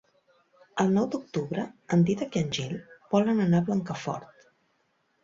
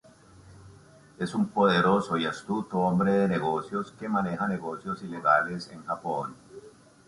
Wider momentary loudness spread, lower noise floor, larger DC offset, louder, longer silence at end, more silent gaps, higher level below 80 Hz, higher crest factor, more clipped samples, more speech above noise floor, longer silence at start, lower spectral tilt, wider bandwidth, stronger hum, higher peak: about the same, 12 LU vs 12 LU; first, -72 dBFS vs -53 dBFS; neither; about the same, -27 LUFS vs -27 LUFS; first, 1 s vs 0.4 s; neither; about the same, -64 dBFS vs -62 dBFS; about the same, 18 dB vs 20 dB; neither; first, 45 dB vs 26 dB; first, 0.75 s vs 0.45 s; about the same, -6.5 dB/octave vs -6.5 dB/octave; second, 7.6 kHz vs 11.5 kHz; neither; about the same, -10 dBFS vs -8 dBFS